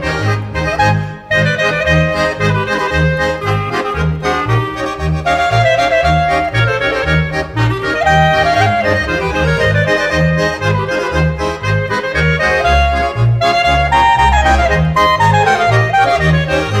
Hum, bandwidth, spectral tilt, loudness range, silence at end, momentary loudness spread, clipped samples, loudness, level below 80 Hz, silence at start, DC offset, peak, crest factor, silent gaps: none; 13 kHz; -5.5 dB/octave; 3 LU; 0 s; 6 LU; under 0.1%; -13 LUFS; -24 dBFS; 0 s; under 0.1%; 0 dBFS; 12 dB; none